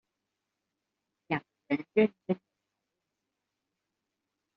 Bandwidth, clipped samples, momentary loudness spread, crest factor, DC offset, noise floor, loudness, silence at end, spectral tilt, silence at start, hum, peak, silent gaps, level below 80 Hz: 5.6 kHz; under 0.1%; 9 LU; 24 dB; under 0.1%; -86 dBFS; -32 LUFS; 2.2 s; -5.5 dB/octave; 1.3 s; none; -14 dBFS; none; -80 dBFS